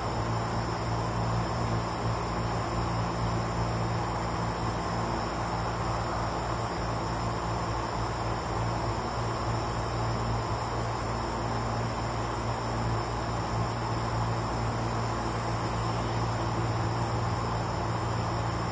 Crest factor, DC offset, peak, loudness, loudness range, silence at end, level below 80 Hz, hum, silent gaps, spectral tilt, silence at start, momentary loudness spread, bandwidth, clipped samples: 14 dB; under 0.1%; -16 dBFS; -31 LUFS; 1 LU; 0 s; -40 dBFS; none; none; -6 dB/octave; 0 s; 2 LU; 8 kHz; under 0.1%